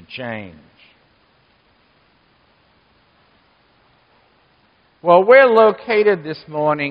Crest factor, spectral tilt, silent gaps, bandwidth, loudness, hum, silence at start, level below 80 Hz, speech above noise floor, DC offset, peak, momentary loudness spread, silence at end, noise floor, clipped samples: 18 dB; -3 dB/octave; none; 5.4 kHz; -14 LUFS; none; 0.1 s; -64 dBFS; 43 dB; under 0.1%; 0 dBFS; 19 LU; 0 s; -57 dBFS; under 0.1%